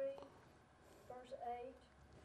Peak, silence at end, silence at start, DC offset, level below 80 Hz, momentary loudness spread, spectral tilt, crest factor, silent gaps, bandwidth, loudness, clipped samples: -38 dBFS; 0 s; 0 s; under 0.1%; -74 dBFS; 17 LU; -5.5 dB/octave; 16 dB; none; 13 kHz; -52 LUFS; under 0.1%